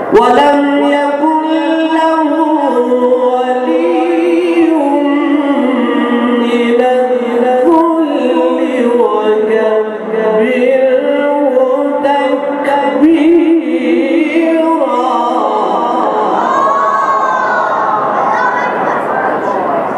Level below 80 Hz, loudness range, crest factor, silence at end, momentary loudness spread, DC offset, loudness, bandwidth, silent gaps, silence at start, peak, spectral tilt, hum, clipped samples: -54 dBFS; 1 LU; 10 dB; 0 s; 4 LU; under 0.1%; -11 LUFS; 11.5 kHz; none; 0 s; 0 dBFS; -5.5 dB/octave; none; under 0.1%